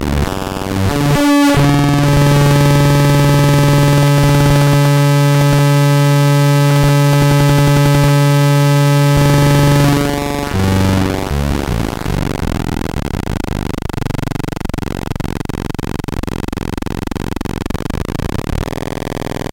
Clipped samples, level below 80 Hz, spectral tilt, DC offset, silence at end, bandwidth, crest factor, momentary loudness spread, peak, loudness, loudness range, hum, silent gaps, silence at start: under 0.1%; -26 dBFS; -6 dB/octave; under 0.1%; 0.15 s; 16.5 kHz; 10 dB; 11 LU; -2 dBFS; -13 LUFS; 11 LU; none; none; 0 s